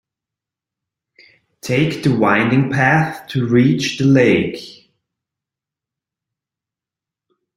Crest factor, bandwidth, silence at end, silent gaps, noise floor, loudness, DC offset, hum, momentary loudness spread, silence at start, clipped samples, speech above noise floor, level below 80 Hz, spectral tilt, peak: 18 dB; 15 kHz; 2.85 s; none; -87 dBFS; -15 LUFS; under 0.1%; none; 9 LU; 1.65 s; under 0.1%; 72 dB; -54 dBFS; -6.5 dB/octave; 0 dBFS